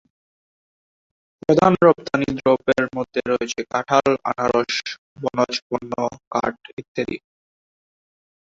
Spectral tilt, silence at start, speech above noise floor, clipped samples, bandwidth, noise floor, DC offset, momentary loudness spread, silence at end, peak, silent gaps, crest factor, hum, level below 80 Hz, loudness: -5.5 dB/octave; 1.5 s; over 70 dB; under 0.1%; 7.8 kHz; under -90 dBFS; under 0.1%; 13 LU; 1.3 s; -2 dBFS; 4.98-5.16 s, 5.62-5.70 s, 6.27-6.31 s, 6.73-6.77 s, 6.88-6.95 s; 20 dB; none; -56 dBFS; -21 LUFS